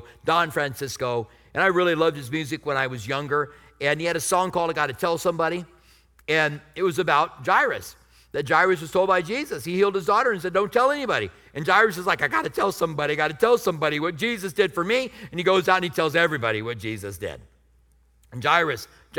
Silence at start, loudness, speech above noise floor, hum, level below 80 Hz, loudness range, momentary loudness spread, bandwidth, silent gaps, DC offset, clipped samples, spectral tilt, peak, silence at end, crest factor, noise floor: 0 s; -23 LUFS; 36 dB; none; -58 dBFS; 3 LU; 11 LU; 19.5 kHz; none; under 0.1%; under 0.1%; -4.5 dB/octave; -4 dBFS; 0 s; 20 dB; -59 dBFS